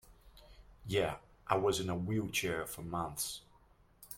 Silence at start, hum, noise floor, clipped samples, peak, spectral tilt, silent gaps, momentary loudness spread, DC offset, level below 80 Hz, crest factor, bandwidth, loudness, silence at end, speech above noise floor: 0.05 s; none; -65 dBFS; under 0.1%; -14 dBFS; -4 dB/octave; none; 9 LU; under 0.1%; -60 dBFS; 24 dB; 16.5 kHz; -36 LUFS; 0 s; 30 dB